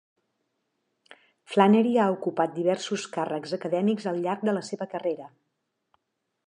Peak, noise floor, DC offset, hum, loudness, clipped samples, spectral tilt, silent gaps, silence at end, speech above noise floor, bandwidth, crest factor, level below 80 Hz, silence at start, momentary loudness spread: -6 dBFS; -80 dBFS; under 0.1%; none; -26 LUFS; under 0.1%; -6 dB/octave; none; 1.2 s; 55 dB; 10.5 kHz; 22 dB; -80 dBFS; 1.5 s; 11 LU